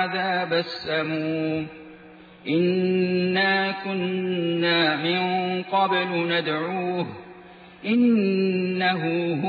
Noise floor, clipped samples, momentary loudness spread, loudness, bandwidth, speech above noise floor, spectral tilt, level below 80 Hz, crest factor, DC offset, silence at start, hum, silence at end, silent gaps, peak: -47 dBFS; under 0.1%; 8 LU; -23 LUFS; 4.9 kHz; 24 dB; -8 dB/octave; -66 dBFS; 16 dB; under 0.1%; 0 s; none; 0 s; none; -8 dBFS